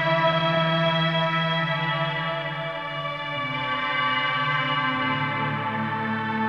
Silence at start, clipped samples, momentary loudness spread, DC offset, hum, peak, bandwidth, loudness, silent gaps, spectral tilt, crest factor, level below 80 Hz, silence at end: 0 s; under 0.1%; 7 LU; under 0.1%; none; -10 dBFS; 6.8 kHz; -24 LUFS; none; -6.5 dB/octave; 16 dB; -60 dBFS; 0 s